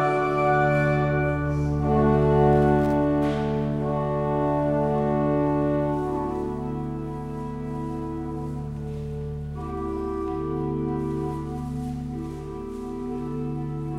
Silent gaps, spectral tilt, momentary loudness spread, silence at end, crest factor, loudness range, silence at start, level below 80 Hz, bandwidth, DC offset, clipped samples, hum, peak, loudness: none; -9 dB/octave; 12 LU; 0 s; 16 dB; 10 LU; 0 s; -38 dBFS; 9.8 kHz; under 0.1%; under 0.1%; none; -8 dBFS; -25 LUFS